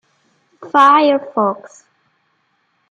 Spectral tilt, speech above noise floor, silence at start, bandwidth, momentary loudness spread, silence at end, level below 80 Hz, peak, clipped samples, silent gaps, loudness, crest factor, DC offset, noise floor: -5 dB/octave; 50 dB; 0.6 s; 9.2 kHz; 10 LU; 1.25 s; -72 dBFS; -2 dBFS; under 0.1%; none; -13 LUFS; 16 dB; under 0.1%; -64 dBFS